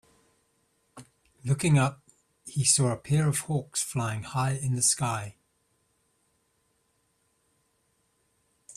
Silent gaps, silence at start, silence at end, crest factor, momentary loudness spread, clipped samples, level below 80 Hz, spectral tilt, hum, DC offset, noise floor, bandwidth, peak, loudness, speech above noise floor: none; 0.95 s; 0.05 s; 22 dB; 13 LU; under 0.1%; -62 dBFS; -4 dB/octave; none; under 0.1%; -72 dBFS; 14.5 kHz; -8 dBFS; -26 LUFS; 46 dB